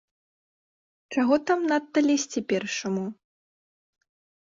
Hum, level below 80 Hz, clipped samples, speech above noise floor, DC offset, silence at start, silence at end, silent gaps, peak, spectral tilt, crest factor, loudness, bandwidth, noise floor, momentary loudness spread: none; -70 dBFS; under 0.1%; over 65 dB; under 0.1%; 1.1 s; 1.3 s; none; -10 dBFS; -4 dB/octave; 18 dB; -25 LUFS; 7.6 kHz; under -90 dBFS; 8 LU